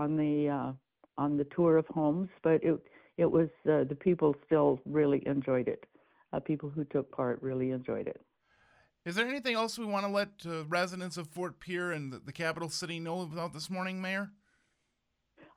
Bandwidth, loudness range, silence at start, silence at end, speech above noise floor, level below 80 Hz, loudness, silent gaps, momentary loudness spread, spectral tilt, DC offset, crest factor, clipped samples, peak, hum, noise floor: 14.5 kHz; 7 LU; 0 s; 1.25 s; 49 dB; -68 dBFS; -32 LUFS; none; 12 LU; -6 dB/octave; under 0.1%; 18 dB; under 0.1%; -14 dBFS; none; -81 dBFS